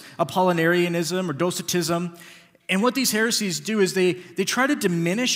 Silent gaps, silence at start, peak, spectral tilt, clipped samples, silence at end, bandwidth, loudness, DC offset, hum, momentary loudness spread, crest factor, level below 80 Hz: none; 0 s; -6 dBFS; -4 dB/octave; under 0.1%; 0 s; 16 kHz; -22 LUFS; under 0.1%; none; 6 LU; 16 dB; -72 dBFS